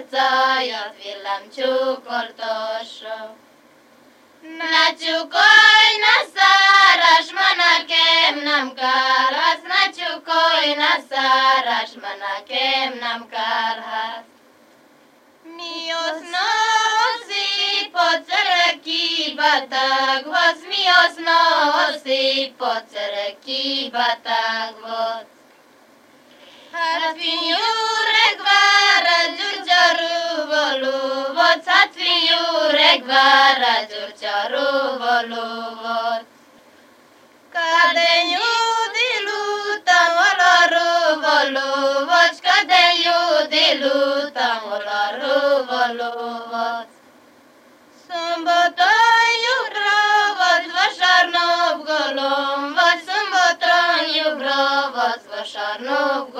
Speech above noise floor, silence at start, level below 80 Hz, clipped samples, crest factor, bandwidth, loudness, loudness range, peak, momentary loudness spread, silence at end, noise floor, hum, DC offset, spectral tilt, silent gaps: 34 dB; 0 s; -86 dBFS; under 0.1%; 18 dB; 16 kHz; -17 LUFS; 10 LU; 0 dBFS; 13 LU; 0 s; -52 dBFS; none; under 0.1%; 0.5 dB/octave; none